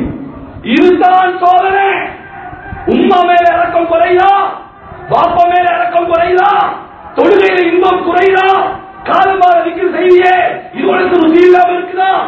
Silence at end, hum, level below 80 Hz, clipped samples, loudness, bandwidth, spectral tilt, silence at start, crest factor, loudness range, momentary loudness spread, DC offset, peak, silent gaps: 0 s; none; -40 dBFS; 1%; -9 LUFS; 7 kHz; -6.5 dB/octave; 0 s; 10 dB; 2 LU; 14 LU; under 0.1%; 0 dBFS; none